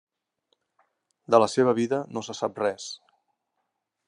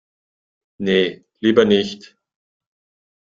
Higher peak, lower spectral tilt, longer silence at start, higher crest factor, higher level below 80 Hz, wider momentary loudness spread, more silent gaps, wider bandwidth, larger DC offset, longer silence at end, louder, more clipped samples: second, -4 dBFS vs 0 dBFS; about the same, -5 dB/octave vs -6 dB/octave; first, 1.3 s vs 0.8 s; about the same, 24 dB vs 20 dB; second, -78 dBFS vs -58 dBFS; first, 16 LU vs 13 LU; neither; first, 11 kHz vs 7.6 kHz; neither; second, 1.1 s vs 1.35 s; second, -25 LUFS vs -18 LUFS; neither